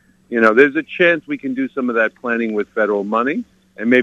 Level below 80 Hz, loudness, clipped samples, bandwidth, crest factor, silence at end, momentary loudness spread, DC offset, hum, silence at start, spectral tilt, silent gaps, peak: -64 dBFS; -17 LUFS; under 0.1%; 8 kHz; 18 dB; 0 s; 11 LU; under 0.1%; none; 0.3 s; -6.5 dB/octave; none; 0 dBFS